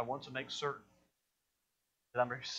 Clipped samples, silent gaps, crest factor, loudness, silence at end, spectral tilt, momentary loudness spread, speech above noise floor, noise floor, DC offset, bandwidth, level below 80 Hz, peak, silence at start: under 0.1%; none; 22 dB; -39 LUFS; 0 s; -3.5 dB/octave; 6 LU; 45 dB; -85 dBFS; under 0.1%; 9.2 kHz; -78 dBFS; -20 dBFS; 0 s